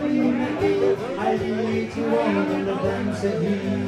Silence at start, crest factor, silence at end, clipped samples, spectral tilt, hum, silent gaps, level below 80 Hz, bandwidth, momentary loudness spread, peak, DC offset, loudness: 0 s; 14 dB; 0 s; under 0.1%; -7 dB/octave; none; none; -52 dBFS; 11.5 kHz; 4 LU; -8 dBFS; under 0.1%; -23 LUFS